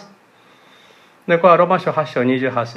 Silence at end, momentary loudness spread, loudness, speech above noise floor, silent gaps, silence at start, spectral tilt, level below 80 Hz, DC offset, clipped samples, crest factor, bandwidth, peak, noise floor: 0 s; 8 LU; -16 LUFS; 35 dB; none; 1.3 s; -7.5 dB/octave; -70 dBFS; under 0.1%; under 0.1%; 18 dB; 7.2 kHz; 0 dBFS; -50 dBFS